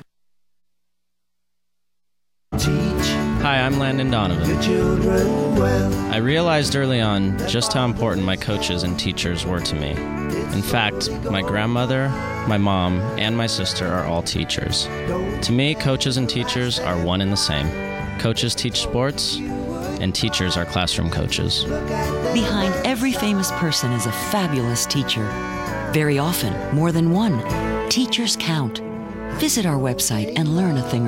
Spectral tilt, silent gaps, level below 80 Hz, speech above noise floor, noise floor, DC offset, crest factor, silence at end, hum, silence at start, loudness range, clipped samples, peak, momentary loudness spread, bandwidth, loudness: -4.5 dB/octave; none; -36 dBFS; 63 dB; -83 dBFS; under 0.1%; 16 dB; 0 s; 60 Hz at -45 dBFS; 2.5 s; 3 LU; under 0.1%; -4 dBFS; 5 LU; 16.5 kHz; -21 LUFS